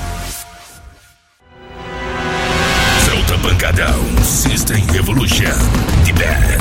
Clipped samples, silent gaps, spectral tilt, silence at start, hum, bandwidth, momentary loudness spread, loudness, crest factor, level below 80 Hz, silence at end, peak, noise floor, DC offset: under 0.1%; none; -4 dB/octave; 0 s; none; 17 kHz; 13 LU; -14 LUFS; 14 dB; -20 dBFS; 0 s; 0 dBFS; -49 dBFS; under 0.1%